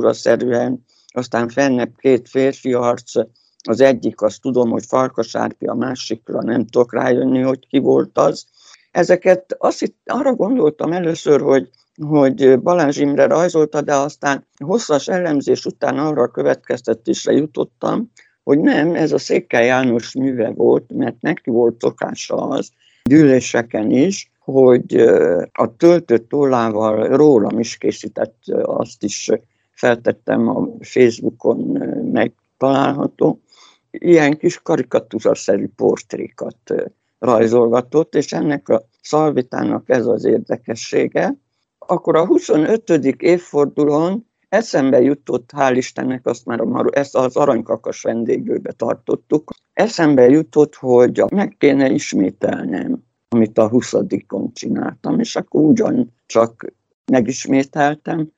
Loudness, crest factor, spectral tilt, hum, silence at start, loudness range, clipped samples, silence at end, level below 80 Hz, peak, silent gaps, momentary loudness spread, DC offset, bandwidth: -17 LUFS; 16 dB; -6 dB/octave; none; 0 s; 4 LU; under 0.1%; 0.1 s; -60 dBFS; 0 dBFS; 56.94-57.04 s; 10 LU; under 0.1%; 8 kHz